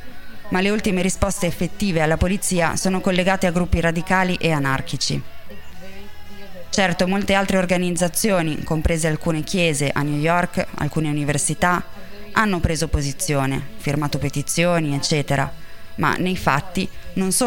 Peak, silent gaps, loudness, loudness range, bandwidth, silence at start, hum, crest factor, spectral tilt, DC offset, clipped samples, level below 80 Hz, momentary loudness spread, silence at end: -2 dBFS; none; -21 LUFS; 2 LU; 17 kHz; 0 s; none; 20 dB; -4.5 dB/octave; under 0.1%; under 0.1%; -36 dBFS; 8 LU; 0 s